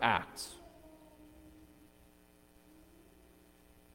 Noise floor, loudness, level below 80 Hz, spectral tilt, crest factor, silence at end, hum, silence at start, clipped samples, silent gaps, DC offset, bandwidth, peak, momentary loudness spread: -64 dBFS; -38 LUFS; -66 dBFS; -3 dB/octave; 30 dB; 2.45 s; 60 Hz at -70 dBFS; 0 s; under 0.1%; none; under 0.1%; 17.5 kHz; -12 dBFS; 21 LU